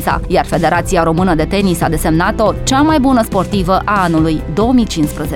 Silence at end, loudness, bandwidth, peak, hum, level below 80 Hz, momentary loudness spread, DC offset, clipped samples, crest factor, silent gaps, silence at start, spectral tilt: 0 s; -13 LUFS; 17.5 kHz; 0 dBFS; none; -24 dBFS; 4 LU; under 0.1%; under 0.1%; 12 dB; none; 0 s; -5.5 dB/octave